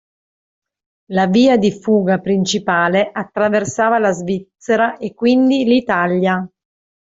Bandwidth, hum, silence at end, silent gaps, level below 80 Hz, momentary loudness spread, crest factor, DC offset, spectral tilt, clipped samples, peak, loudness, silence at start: 7.8 kHz; none; 0.6 s; none; -56 dBFS; 8 LU; 14 dB; under 0.1%; -5.5 dB/octave; under 0.1%; -2 dBFS; -16 LUFS; 1.1 s